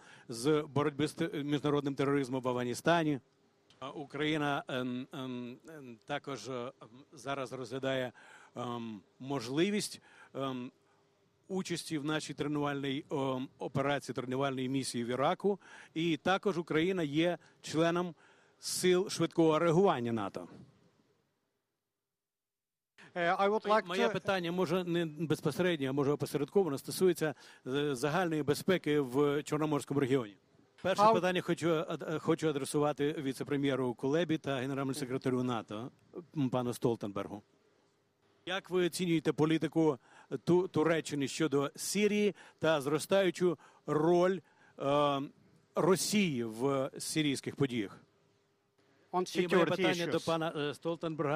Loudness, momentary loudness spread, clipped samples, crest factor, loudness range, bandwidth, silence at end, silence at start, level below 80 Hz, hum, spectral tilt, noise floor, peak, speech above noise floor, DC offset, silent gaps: -33 LUFS; 12 LU; under 0.1%; 20 dB; 7 LU; 15.5 kHz; 0 s; 0.1 s; -74 dBFS; none; -5.5 dB/octave; under -90 dBFS; -14 dBFS; over 57 dB; under 0.1%; none